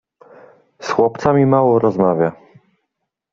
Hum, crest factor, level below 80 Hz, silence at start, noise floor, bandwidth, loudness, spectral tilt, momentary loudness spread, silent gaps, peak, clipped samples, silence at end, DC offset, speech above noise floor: none; 16 dB; -56 dBFS; 0.8 s; -76 dBFS; 7.4 kHz; -15 LUFS; -7.5 dB/octave; 8 LU; none; -2 dBFS; under 0.1%; 1 s; under 0.1%; 62 dB